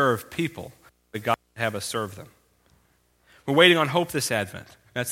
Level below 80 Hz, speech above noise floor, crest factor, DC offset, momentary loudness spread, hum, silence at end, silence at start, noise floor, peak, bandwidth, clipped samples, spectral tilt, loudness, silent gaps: -62 dBFS; 41 dB; 26 dB; under 0.1%; 23 LU; 60 Hz at -55 dBFS; 0 s; 0 s; -65 dBFS; 0 dBFS; 16.5 kHz; under 0.1%; -4 dB/octave; -24 LUFS; none